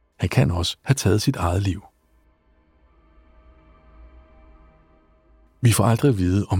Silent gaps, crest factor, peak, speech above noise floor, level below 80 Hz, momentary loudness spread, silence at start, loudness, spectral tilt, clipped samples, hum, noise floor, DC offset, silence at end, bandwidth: none; 20 dB; -4 dBFS; 41 dB; -42 dBFS; 7 LU; 0.2 s; -21 LUFS; -6 dB/octave; under 0.1%; none; -60 dBFS; under 0.1%; 0 s; 16.5 kHz